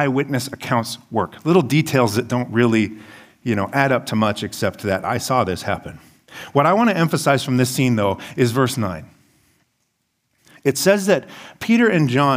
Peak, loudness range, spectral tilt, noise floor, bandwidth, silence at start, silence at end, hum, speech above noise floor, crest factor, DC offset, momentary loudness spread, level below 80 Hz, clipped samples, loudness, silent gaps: 0 dBFS; 3 LU; -5.5 dB/octave; -71 dBFS; 16 kHz; 0 s; 0 s; none; 52 dB; 18 dB; under 0.1%; 10 LU; -56 dBFS; under 0.1%; -19 LUFS; none